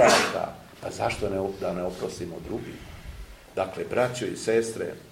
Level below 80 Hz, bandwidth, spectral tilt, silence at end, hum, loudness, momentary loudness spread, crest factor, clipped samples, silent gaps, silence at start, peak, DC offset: -50 dBFS; 16 kHz; -3.5 dB/octave; 0 s; none; -28 LUFS; 16 LU; 22 dB; under 0.1%; none; 0 s; -6 dBFS; under 0.1%